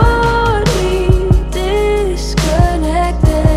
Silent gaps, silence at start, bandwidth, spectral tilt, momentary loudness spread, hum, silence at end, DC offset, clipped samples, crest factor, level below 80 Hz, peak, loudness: none; 0 s; 14 kHz; -6 dB/octave; 4 LU; none; 0 s; under 0.1%; under 0.1%; 12 dB; -16 dBFS; 0 dBFS; -14 LUFS